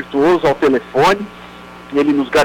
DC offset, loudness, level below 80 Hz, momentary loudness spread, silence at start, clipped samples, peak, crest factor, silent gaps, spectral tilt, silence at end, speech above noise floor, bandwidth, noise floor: under 0.1%; -15 LUFS; -44 dBFS; 22 LU; 0 s; under 0.1%; -8 dBFS; 8 dB; none; -5.5 dB/octave; 0 s; 21 dB; 18 kHz; -35 dBFS